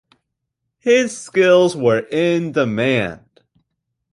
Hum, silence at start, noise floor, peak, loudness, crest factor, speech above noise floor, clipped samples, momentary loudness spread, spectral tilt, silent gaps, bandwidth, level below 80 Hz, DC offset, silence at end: none; 0.85 s; -77 dBFS; -2 dBFS; -17 LUFS; 16 dB; 61 dB; under 0.1%; 7 LU; -5 dB/octave; none; 11.5 kHz; -56 dBFS; under 0.1%; 0.95 s